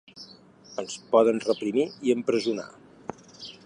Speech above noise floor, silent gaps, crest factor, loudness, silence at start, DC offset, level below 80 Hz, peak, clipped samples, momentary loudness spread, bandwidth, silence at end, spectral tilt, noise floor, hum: 26 dB; none; 20 dB; -26 LUFS; 0.15 s; under 0.1%; -72 dBFS; -6 dBFS; under 0.1%; 22 LU; 10 kHz; 0.15 s; -5 dB/octave; -51 dBFS; none